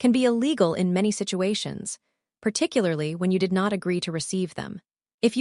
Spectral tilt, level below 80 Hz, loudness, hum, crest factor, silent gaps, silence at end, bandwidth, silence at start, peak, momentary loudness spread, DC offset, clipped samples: -5 dB/octave; -66 dBFS; -25 LUFS; none; 18 dB; 5.14-5.18 s; 0 s; 11.5 kHz; 0 s; -6 dBFS; 12 LU; under 0.1%; under 0.1%